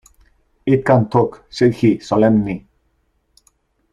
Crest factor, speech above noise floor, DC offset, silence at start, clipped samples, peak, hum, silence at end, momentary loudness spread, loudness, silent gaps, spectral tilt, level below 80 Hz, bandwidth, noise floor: 18 dB; 49 dB; under 0.1%; 0.65 s; under 0.1%; 0 dBFS; none; 1.35 s; 11 LU; -16 LUFS; none; -8 dB/octave; -48 dBFS; 11 kHz; -64 dBFS